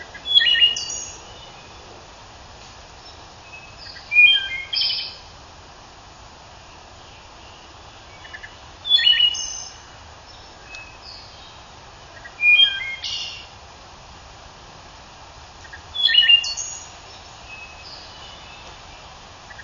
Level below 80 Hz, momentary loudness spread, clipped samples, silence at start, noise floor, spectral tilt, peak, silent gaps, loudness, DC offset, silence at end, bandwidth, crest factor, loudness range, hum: -52 dBFS; 29 LU; under 0.1%; 0 s; -43 dBFS; 1 dB/octave; -2 dBFS; none; -16 LUFS; under 0.1%; 0 s; 7.4 kHz; 22 dB; 14 LU; none